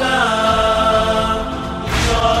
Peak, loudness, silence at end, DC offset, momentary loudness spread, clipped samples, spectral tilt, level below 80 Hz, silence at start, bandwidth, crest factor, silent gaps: -4 dBFS; -16 LUFS; 0 s; under 0.1%; 7 LU; under 0.1%; -4 dB/octave; -26 dBFS; 0 s; 15.5 kHz; 12 dB; none